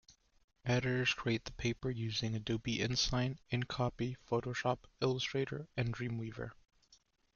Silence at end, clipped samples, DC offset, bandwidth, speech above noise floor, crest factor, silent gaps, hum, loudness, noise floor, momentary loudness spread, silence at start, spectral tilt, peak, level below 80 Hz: 0.8 s; under 0.1%; under 0.1%; 7.2 kHz; 33 dB; 18 dB; 0.44-0.48 s; none; -37 LUFS; -70 dBFS; 8 LU; 0.1 s; -5 dB/octave; -18 dBFS; -58 dBFS